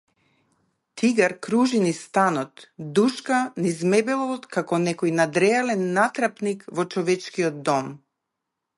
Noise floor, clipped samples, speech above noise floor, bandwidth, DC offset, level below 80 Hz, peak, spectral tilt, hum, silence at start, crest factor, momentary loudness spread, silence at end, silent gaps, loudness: -82 dBFS; under 0.1%; 59 dB; 11.5 kHz; under 0.1%; -72 dBFS; -6 dBFS; -5 dB/octave; none; 0.95 s; 18 dB; 8 LU; 0.8 s; none; -23 LUFS